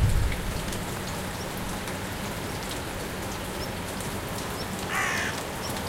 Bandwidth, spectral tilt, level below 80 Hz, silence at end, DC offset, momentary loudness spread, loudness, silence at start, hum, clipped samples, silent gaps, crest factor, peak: 17 kHz; -4 dB/octave; -36 dBFS; 0 s; under 0.1%; 6 LU; -31 LUFS; 0 s; none; under 0.1%; none; 18 dB; -12 dBFS